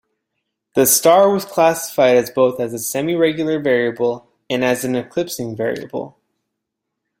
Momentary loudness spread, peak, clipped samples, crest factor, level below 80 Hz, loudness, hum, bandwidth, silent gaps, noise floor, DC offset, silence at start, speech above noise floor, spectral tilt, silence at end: 12 LU; 0 dBFS; under 0.1%; 18 dB; -60 dBFS; -17 LUFS; none; 16.5 kHz; none; -78 dBFS; under 0.1%; 0.75 s; 62 dB; -3.5 dB/octave; 1.1 s